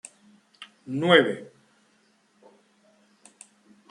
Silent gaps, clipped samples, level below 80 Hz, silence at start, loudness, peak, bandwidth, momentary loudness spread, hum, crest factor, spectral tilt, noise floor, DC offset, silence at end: none; under 0.1%; -78 dBFS; 0.6 s; -22 LUFS; -2 dBFS; 11 kHz; 28 LU; none; 26 dB; -5 dB/octave; -65 dBFS; under 0.1%; 2.45 s